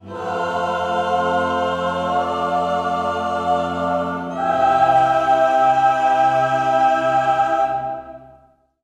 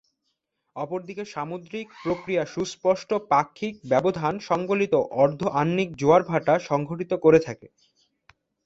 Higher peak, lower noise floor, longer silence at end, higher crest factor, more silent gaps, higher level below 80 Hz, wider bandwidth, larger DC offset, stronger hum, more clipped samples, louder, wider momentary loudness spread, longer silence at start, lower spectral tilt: about the same, -4 dBFS vs -4 dBFS; second, -53 dBFS vs -77 dBFS; second, 0.55 s vs 1 s; second, 14 dB vs 20 dB; neither; first, -54 dBFS vs -60 dBFS; first, 11 kHz vs 7.8 kHz; neither; neither; neither; first, -18 LUFS vs -24 LUFS; second, 8 LU vs 14 LU; second, 0.05 s vs 0.75 s; about the same, -5.5 dB/octave vs -6.5 dB/octave